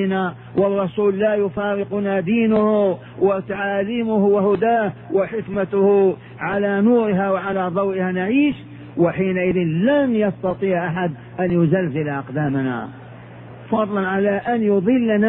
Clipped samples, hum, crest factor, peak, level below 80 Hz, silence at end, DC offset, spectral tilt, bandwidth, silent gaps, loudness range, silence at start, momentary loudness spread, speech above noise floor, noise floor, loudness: under 0.1%; none; 14 dB; -4 dBFS; -52 dBFS; 0 s; under 0.1%; -11 dB/octave; 4 kHz; none; 3 LU; 0 s; 8 LU; 20 dB; -38 dBFS; -19 LUFS